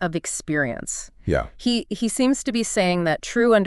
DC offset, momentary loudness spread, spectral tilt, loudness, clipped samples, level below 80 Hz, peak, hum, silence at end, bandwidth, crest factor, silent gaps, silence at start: under 0.1%; 6 LU; -4 dB/octave; -23 LUFS; under 0.1%; -42 dBFS; -4 dBFS; none; 0 s; 12 kHz; 18 dB; none; 0 s